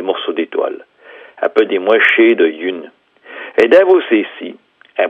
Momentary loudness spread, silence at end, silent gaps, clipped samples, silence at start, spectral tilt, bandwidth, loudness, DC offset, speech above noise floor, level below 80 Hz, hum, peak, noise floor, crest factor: 20 LU; 0 s; none; under 0.1%; 0 s; -5.5 dB/octave; 6 kHz; -13 LUFS; under 0.1%; 29 dB; -66 dBFS; none; 0 dBFS; -40 dBFS; 14 dB